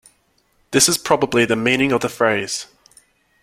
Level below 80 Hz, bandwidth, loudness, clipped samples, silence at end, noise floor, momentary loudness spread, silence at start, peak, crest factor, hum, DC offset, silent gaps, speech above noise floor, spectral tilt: -54 dBFS; 16.5 kHz; -17 LUFS; under 0.1%; 0.8 s; -62 dBFS; 11 LU; 0.7 s; 0 dBFS; 20 dB; none; under 0.1%; none; 44 dB; -3 dB/octave